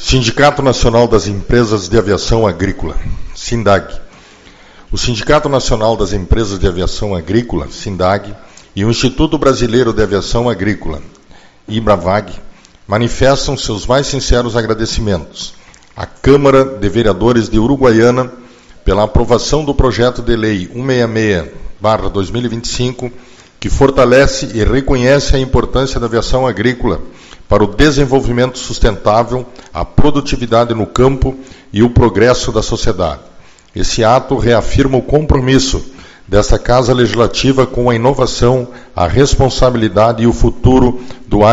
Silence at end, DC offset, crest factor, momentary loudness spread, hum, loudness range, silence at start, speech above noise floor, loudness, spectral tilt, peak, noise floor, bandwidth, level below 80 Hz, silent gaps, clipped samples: 0 s; under 0.1%; 12 dB; 11 LU; none; 4 LU; 0 s; 29 dB; -12 LUFS; -5.5 dB/octave; 0 dBFS; -40 dBFS; 8 kHz; -22 dBFS; none; 0.4%